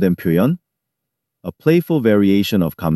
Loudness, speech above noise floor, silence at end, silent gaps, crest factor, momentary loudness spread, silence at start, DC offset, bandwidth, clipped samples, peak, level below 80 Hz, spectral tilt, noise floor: -16 LUFS; 64 dB; 0 s; none; 16 dB; 13 LU; 0 s; under 0.1%; 13.5 kHz; under 0.1%; -2 dBFS; -50 dBFS; -7.5 dB/octave; -79 dBFS